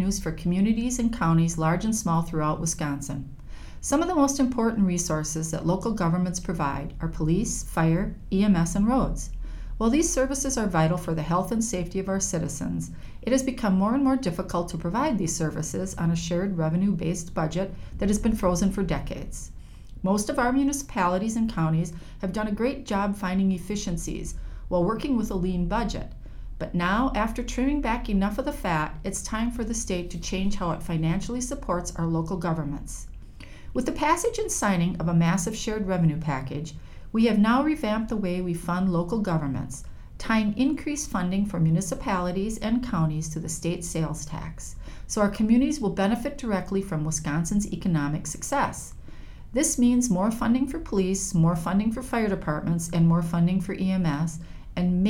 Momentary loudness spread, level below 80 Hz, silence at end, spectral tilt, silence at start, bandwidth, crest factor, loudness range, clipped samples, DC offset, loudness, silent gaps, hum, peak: 11 LU; -38 dBFS; 0 s; -5.5 dB/octave; 0 s; 16.5 kHz; 16 dB; 3 LU; under 0.1%; under 0.1%; -26 LUFS; none; none; -10 dBFS